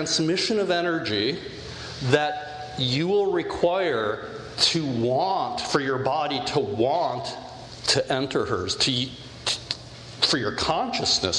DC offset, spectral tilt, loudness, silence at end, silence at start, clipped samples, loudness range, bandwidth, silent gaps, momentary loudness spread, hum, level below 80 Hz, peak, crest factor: under 0.1%; -3.5 dB/octave; -24 LUFS; 0 s; 0 s; under 0.1%; 1 LU; 11.5 kHz; none; 12 LU; none; -52 dBFS; -4 dBFS; 20 dB